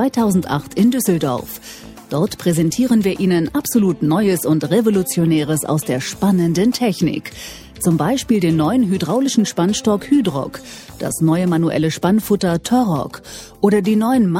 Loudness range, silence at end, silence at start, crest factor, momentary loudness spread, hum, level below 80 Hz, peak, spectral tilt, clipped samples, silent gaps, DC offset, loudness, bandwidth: 2 LU; 0 s; 0 s; 16 dB; 11 LU; none; -46 dBFS; -2 dBFS; -6 dB/octave; under 0.1%; none; under 0.1%; -17 LUFS; 16.5 kHz